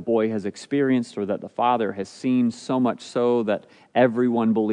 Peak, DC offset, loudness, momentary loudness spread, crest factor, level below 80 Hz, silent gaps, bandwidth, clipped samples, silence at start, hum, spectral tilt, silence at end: -6 dBFS; under 0.1%; -23 LUFS; 8 LU; 18 dB; -74 dBFS; none; 10 kHz; under 0.1%; 0 s; none; -6.5 dB/octave; 0 s